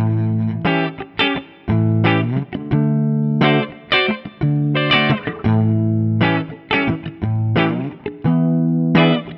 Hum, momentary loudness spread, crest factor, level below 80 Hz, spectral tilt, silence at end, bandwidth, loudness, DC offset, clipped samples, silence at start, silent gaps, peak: none; 7 LU; 16 dB; -46 dBFS; -9 dB/octave; 0 s; 5.8 kHz; -18 LUFS; under 0.1%; under 0.1%; 0 s; none; -2 dBFS